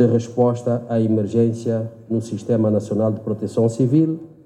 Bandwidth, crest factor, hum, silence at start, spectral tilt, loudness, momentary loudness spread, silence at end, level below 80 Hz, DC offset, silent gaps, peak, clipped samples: 10.5 kHz; 14 dB; none; 0 s; -9 dB/octave; -20 LUFS; 7 LU; 0.2 s; -66 dBFS; under 0.1%; none; -4 dBFS; under 0.1%